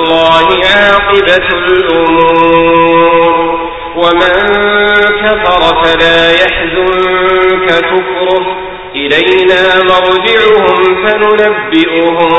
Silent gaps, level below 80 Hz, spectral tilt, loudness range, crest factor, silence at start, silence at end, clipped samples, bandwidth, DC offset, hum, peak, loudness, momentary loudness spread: none; -34 dBFS; -5 dB/octave; 2 LU; 8 dB; 0 s; 0 s; 0.9%; 8 kHz; 0.6%; none; 0 dBFS; -7 LUFS; 5 LU